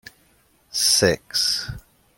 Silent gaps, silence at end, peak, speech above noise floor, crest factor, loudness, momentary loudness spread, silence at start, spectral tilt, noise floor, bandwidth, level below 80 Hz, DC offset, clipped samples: none; 0.4 s; -4 dBFS; 39 dB; 20 dB; -19 LUFS; 17 LU; 0.75 s; -2 dB/octave; -60 dBFS; 16.5 kHz; -50 dBFS; under 0.1%; under 0.1%